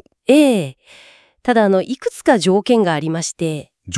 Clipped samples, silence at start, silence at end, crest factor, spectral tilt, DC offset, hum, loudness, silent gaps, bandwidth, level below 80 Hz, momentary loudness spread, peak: under 0.1%; 0.3 s; 0 s; 16 dB; -5 dB/octave; under 0.1%; none; -16 LUFS; none; 12 kHz; -58 dBFS; 11 LU; 0 dBFS